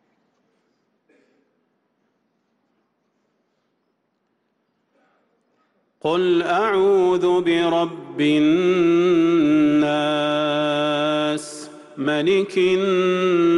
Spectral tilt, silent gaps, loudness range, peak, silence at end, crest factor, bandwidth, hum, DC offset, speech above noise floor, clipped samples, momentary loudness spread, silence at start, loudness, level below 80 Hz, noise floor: -6 dB/octave; none; 7 LU; -10 dBFS; 0 s; 12 dB; 11.5 kHz; none; under 0.1%; 53 dB; under 0.1%; 7 LU; 6.05 s; -19 LUFS; -64 dBFS; -71 dBFS